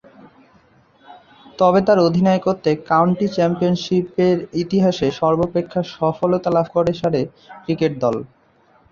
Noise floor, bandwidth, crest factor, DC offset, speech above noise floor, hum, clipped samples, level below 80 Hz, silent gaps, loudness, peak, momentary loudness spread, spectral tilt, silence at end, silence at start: -55 dBFS; 7.2 kHz; 16 dB; under 0.1%; 38 dB; none; under 0.1%; -52 dBFS; none; -18 LUFS; -2 dBFS; 7 LU; -7.5 dB/octave; 0.65 s; 1.1 s